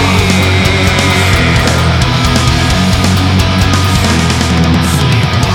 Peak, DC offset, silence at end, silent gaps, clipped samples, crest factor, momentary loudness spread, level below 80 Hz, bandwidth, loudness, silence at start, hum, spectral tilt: 0 dBFS; under 0.1%; 0 s; none; under 0.1%; 10 dB; 1 LU; -20 dBFS; 18.5 kHz; -9 LUFS; 0 s; none; -5 dB/octave